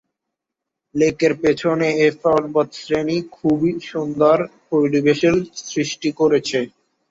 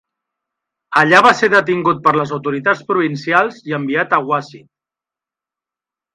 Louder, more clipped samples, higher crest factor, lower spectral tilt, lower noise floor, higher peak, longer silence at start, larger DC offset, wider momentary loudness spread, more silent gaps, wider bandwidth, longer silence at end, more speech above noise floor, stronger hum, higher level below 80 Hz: second, -19 LUFS vs -14 LUFS; neither; about the same, 16 dB vs 16 dB; about the same, -5.5 dB/octave vs -5.5 dB/octave; second, -83 dBFS vs -88 dBFS; about the same, -2 dBFS vs 0 dBFS; about the same, 0.95 s vs 0.9 s; neither; second, 8 LU vs 11 LU; neither; second, 7.8 kHz vs 11.5 kHz; second, 0.45 s vs 1.55 s; second, 65 dB vs 73 dB; neither; first, -54 dBFS vs -60 dBFS